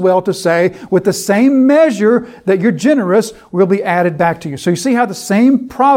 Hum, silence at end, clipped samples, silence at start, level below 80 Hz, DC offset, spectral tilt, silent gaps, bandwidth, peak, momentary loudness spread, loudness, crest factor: none; 0 s; under 0.1%; 0 s; -54 dBFS; under 0.1%; -6 dB/octave; none; 16.5 kHz; 0 dBFS; 6 LU; -13 LUFS; 12 dB